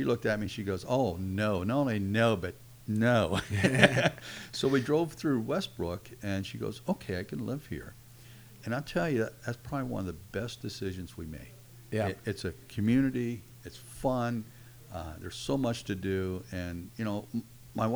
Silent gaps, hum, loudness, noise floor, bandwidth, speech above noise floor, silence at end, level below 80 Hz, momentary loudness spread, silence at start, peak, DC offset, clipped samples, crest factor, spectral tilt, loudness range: none; none; -32 LUFS; -52 dBFS; over 20 kHz; 21 dB; 0 s; -56 dBFS; 15 LU; 0 s; -4 dBFS; under 0.1%; under 0.1%; 28 dB; -6 dB/octave; 8 LU